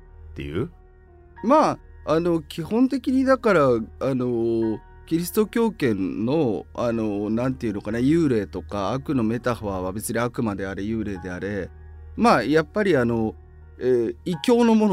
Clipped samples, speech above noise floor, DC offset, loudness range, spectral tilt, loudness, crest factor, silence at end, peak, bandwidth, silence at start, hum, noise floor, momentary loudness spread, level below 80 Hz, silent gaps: under 0.1%; 27 dB; under 0.1%; 4 LU; -6.5 dB/octave; -23 LUFS; 18 dB; 0 s; -4 dBFS; 16 kHz; 0.2 s; none; -49 dBFS; 11 LU; -46 dBFS; none